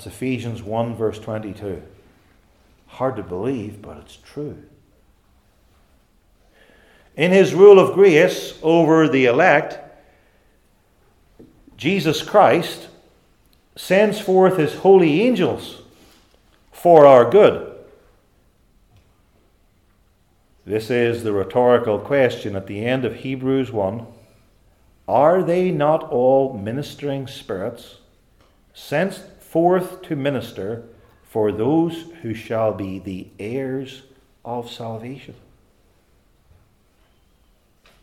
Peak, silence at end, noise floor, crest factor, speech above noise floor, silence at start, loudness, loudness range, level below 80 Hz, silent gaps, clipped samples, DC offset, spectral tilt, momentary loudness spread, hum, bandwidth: 0 dBFS; 2.7 s; -59 dBFS; 20 dB; 42 dB; 0 s; -18 LUFS; 15 LU; -58 dBFS; none; under 0.1%; under 0.1%; -6.5 dB/octave; 19 LU; none; 15 kHz